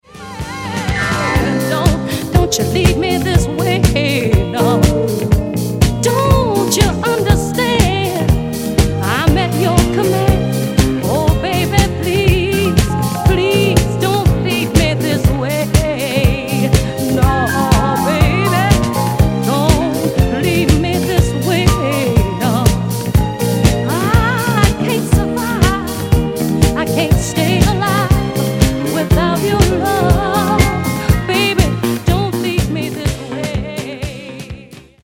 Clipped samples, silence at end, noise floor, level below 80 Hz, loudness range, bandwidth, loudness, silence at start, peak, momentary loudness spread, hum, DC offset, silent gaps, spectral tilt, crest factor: under 0.1%; 0.25 s; -36 dBFS; -22 dBFS; 1 LU; 17 kHz; -14 LUFS; 0.15 s; 0 dBFS; 4 LU; none; under 0.1%; none; -5.5 dB/octave; 14 dB